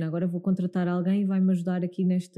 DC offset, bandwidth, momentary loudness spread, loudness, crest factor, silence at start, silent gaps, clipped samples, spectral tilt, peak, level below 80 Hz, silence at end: under 0.1%; 9 kHz; 4 LU; -26 LUFS; 10 dB; 0 s; none; under 0.1%; -9 dB/octave; -16 dBFS; -72 dBFS; 0.1 s